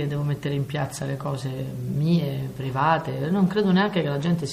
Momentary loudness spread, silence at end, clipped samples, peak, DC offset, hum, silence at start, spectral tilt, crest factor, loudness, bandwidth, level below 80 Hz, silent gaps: 9 LU; 0 s; under 0.1%; -8 dBFS; under 0.1%; none; 0 s; -7 dB/octave; 16 dB; -25 LUFS; 15.5 kHz; -54 dBFS; none